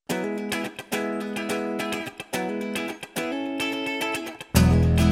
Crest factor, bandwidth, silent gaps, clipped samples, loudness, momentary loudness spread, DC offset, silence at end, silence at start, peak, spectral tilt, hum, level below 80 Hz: 22 dB; 16.5 kHz; none; under 0.1%; -26 LUFS; 11 LU; under 0.1%; 0 s; 0.1 s; -4 dBFS; -5.5 dB/octave; none; -36 dBFS